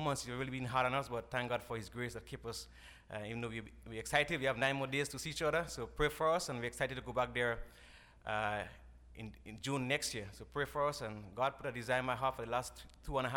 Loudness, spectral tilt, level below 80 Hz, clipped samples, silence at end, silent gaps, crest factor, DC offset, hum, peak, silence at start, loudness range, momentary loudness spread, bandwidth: -38 LUFS; -4 dB/octave; -56 dBFS; under 0.1%; 0 s; none; 24 dB; under 0.1%; none; -16 dBFS; 0 s; 4 LU; 15 LU; over 20 kHz